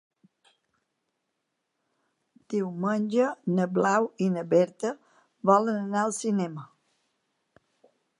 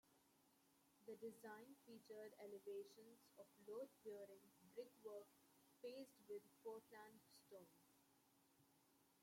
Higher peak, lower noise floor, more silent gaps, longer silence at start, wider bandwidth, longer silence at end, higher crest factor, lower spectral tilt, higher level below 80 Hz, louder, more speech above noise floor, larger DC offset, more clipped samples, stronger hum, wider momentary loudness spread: first, -8 dBFS vs -44 dBFS; about the same, -80 dBFS vs -79 dBFS; neither; first, 2.5 s vs 0.05 s; second, 11.5 kHz vs 16.5 kHz; first, 1.55 s vs 0 s; about the same, 20 dB vs 18 dB; first, -6.5 dB/octave vs -4.5 dB/octave; first, -80 dBFS vs under -90 dBFS; first, -26 LUFS vs -60 LUFS; first, 55 dB vs 20 dB; neither; neither; neither; about the same, 10 LU vs 10 LU